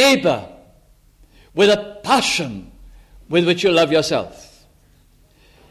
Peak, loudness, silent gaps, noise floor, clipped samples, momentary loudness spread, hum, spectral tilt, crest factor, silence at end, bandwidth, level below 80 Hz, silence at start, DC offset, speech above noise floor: -2 dBFS; -17 LUFS; none; -53 dBFS; under 0.1%; 14 LU; none; -4 dB/octave; 18 dB; 1.35 s; 15 kHz; -50 dBFS; 0 s; under 0.1%; 36 dB